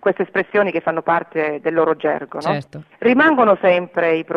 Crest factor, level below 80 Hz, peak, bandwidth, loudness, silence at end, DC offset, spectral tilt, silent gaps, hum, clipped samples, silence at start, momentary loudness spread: 16 dB; -66 dBFS; -2 dBFS; 9.6 kHz; -17 LUFS; 0 s; under 0.1%; -7.5 dB/octave; none; none; under 0.1%; 0.05 s; 9 LU